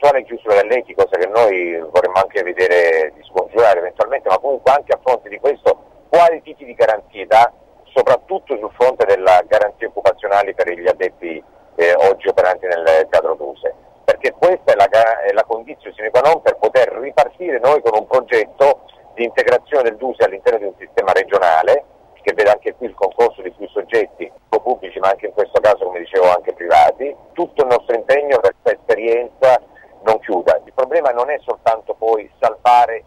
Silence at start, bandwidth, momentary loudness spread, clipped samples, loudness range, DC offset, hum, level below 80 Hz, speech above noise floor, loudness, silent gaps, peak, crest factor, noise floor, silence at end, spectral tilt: 0 s; 12 kHz; 10 LU; under 0.1%; 2 LU; under 0.1%; none; -54 dBFS; 23 dB; -15 LUFS; none; -2 dBFS; 12 dB; -37 dBFS; 0.1 s; -4.5 dB/octave